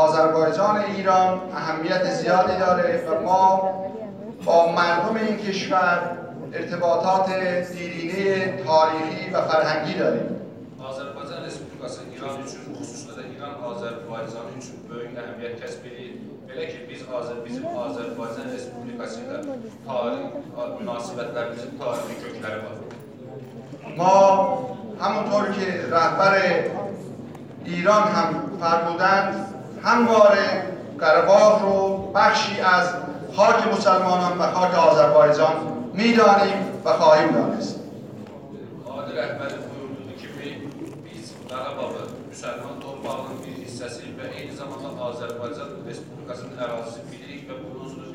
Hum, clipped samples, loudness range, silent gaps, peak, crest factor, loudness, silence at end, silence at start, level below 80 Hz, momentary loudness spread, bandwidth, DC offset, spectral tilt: none; under 0.1%; 16 LU; none; -2 dBFS; 20 dB; -21 LUFS; 0 s; 0 s; -64 dBFS; 20 LU; 10.5 kHz; under 0.1%; -5 dB/octave